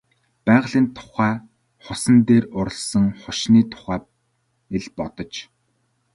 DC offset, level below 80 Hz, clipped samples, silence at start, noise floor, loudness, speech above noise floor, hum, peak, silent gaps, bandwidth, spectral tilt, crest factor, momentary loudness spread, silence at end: under 0.1%; -50 dBFS; under 0.1%; 0.45 s; -69 dBFS; -20 LUFS; 49 dB; none; -2 dBFS; none; 11.5 kHz; -5.5 dB/octave; 18 dB; 14 LU; 0.7 s